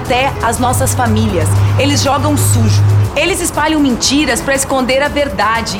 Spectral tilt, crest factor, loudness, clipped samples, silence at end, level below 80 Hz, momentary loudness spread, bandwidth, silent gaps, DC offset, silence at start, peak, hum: -4.5 dB/octave; 12 dB; -12 LUFS; under 0.1%; 0 s; -28 dBFS; 3 LU; 17 kHz; none; under 0.1%; 0 s; 0 dBFS; none